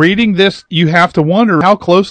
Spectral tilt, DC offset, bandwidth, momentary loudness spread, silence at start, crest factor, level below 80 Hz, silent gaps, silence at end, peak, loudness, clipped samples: -6.5 dB/octave; under 0.1%; 9.2 kHz; 3 LU; 0 s; 10 dB; -44 dBFS; none; 0 s; 0 dBFS; -10 LUFS; 0.6%